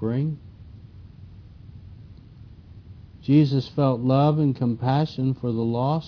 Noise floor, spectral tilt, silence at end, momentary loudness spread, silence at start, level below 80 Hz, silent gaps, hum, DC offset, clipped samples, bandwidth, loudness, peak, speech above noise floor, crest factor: -45 dBFS; -10 dB/octave; 0 s; 18 LU; 0 s; -52 dBFS; none; none; under 0.1%; under 0.1%; 5.4 kHz; -22 LUFS; -6 dBFS; 24 dB; 18 dB